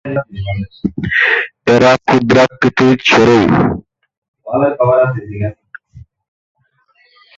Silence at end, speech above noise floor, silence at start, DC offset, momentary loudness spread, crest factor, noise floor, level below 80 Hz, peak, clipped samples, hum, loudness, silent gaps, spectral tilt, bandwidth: 1.4 s; 44 dB; 0.05 s; under 0.1%; 13 LU; 14 dB; -56 dBFS; -40 dBFS; 0 dBFS; under 0.1%; none; -12 LUFS; 4.18-4.22 s, 4.28-4.34 s; -6 dB/octave; 7.8 kHz